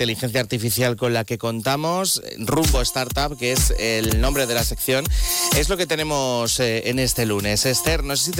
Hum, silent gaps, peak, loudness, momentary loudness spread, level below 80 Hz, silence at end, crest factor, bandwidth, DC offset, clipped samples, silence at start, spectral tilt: none; none; -8 dBFS; -20 LUFS; 4 LU; -28 dBFS; 0 s; 12 dB; 17.5 kHz; under 0.1%; under 0.1%; 0 s; -3.5 dB/octave